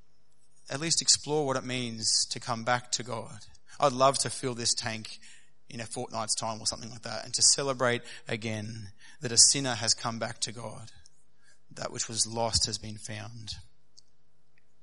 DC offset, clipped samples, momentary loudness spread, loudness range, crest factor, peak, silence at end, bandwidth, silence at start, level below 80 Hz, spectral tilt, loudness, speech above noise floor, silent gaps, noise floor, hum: 0.4%; under 0.1%; 19 LU; 7 LU; 26 dB; -6 dBFS; 1.2 s; 11.5 kHz; 0.65 s; -60 dBFS; -2 dB/octave; -27 LUFS; 43 dB; none; -73 dBFS; none